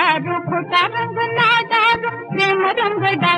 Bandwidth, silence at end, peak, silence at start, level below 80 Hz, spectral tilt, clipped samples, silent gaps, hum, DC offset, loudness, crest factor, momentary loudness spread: 10.5 kHz; 0 s; -4 dBFS; 0 s; -60 dBFS; -5 dB/octave; under 0.1%; none; none; under 0.1%; -17 LUFS; 14 dB; 7 LU